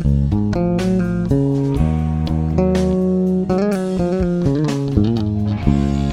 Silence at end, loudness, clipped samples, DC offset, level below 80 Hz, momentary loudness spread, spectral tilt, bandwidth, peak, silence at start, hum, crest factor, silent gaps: 0 s; -18 LUFS; under 0.1%; under 0.1%; -28 dBFS; 2 LU; -8.5 dB/octave; 11.5 kHz; -2 dBFS; 0 s; none; 16 dB; none